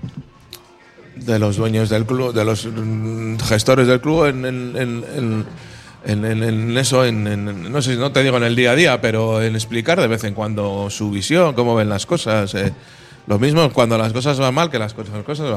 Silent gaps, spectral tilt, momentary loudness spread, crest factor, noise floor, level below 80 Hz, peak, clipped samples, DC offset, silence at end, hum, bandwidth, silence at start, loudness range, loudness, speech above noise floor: none; -5.5 dB/octave; 10 LU; 18 dB; -45 dBFS; -46 dBFS; 0 dBFS; under 0.1%; under 0.1%; 0 s; none; 13.5 kHz; 0 s; 4 LU; -18 LUFS; 28 dB